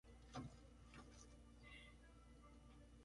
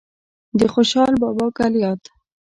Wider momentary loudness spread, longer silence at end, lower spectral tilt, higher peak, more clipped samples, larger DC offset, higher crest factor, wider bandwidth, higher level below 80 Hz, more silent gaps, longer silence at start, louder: about the same, 10 LU vs 8 LU; second, 0 s vs 0.55 s; about the same, -5 dB/octave vs -5.5 dB/octave; second, -40 dBFS vs -4 dBFS; neither; neither; first, 22 dB vs 16 dB; about the same, 11 kHz vs 11 kHz; second, -66 dBFS vs -50 dBFS; neither; second, 0.05 s vs 0.55 s; second, -62 LUFS vs -18 LUFS